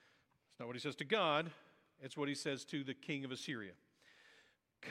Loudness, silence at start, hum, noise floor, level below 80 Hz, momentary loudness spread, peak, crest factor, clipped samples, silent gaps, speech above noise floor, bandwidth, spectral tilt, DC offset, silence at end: -41 LUFS; 0.6 s; none; -75 dBFS; -88 dBFS; 17 LU; -20 dBFS; 24 dB; under 0.1%; none; 33 dB; 15 kHz; -4.5 dB/octave; under 0.1%; 0 s